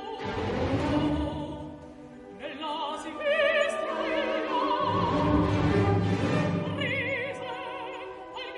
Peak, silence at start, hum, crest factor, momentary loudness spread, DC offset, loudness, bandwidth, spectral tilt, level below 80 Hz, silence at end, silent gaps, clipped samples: -14 dBFS; 0 s; none; 16 dB; 15 LU; under 0.1%; -28 LUFS; 11 kHz; -6.5 dB/octave; -46 dBFS; 0 s; none; under 0.1%